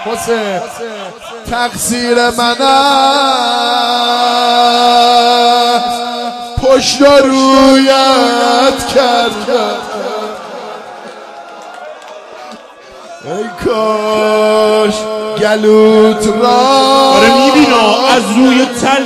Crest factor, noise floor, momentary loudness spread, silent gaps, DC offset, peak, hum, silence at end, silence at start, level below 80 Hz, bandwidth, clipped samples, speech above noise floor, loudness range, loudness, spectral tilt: 10 dB; -33 dBFS; 20 LU; none; under 0.1%; 0 dBFS; none; 0 s; 0 s; -40 dBFS; 15 kHz; 0.1%; 24 dB; 12 LU; -9 LUFS; -3 dB/octave